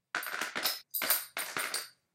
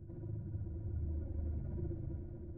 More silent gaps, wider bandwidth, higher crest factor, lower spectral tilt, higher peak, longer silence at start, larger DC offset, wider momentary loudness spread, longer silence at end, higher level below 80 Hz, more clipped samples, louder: neither; first, 17 kHz vs 1.7 kHz; first, 26 dB vs 12 dB; second, 1 dB/octave vs -13 dB/octave; first, -10 dBFS vs -30 dBFS; first, 0.15 s vs 0 s; second, under 0.1% vs 0.1%; first, 7 LU vs 4 LU; first, 0.25 s vs 0 s; second, -86 dBFS vs -44 dBFS; neither; first, -33 LUFS vs -43 LUFS